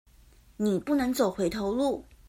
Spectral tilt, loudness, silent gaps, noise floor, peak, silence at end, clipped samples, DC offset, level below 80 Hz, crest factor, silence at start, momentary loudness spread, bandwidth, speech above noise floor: -5.5 dB/octave; -28 LUFS; none; -57 dBFS; -14 dBFS; 0.25 s; under 0.1%; under 0.1%; -54 dBFS; 16 dB; 0.6 s; 4 LU; 16 kHz; 30 dB